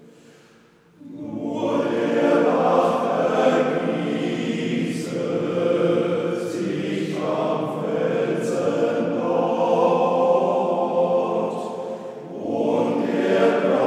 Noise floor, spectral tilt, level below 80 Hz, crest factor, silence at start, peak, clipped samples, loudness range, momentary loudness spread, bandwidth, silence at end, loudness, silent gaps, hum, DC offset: -53 dBFS; -6.5 dB/octave; -74 dBFS; 16 dB; 1.05 s; -6 dBFS; under 0.1%; 3 LU; 9 LU; 12 kHz; 0 s; -22 LUFS; none; none; under 0.1%